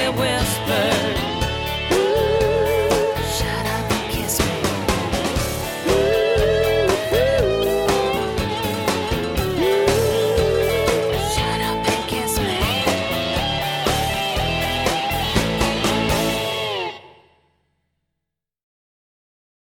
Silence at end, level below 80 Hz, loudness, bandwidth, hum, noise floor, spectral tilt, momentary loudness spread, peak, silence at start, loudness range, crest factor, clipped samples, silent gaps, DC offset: 2.65 s; -34 dBFS; -20 LUFS; 19 kHz; none; -82 dBFS; -4 dB/octave; 5 LU; -4 dBFS; 0 s; 3 LU; 16 dB; under 0.1%; none; under 0.1%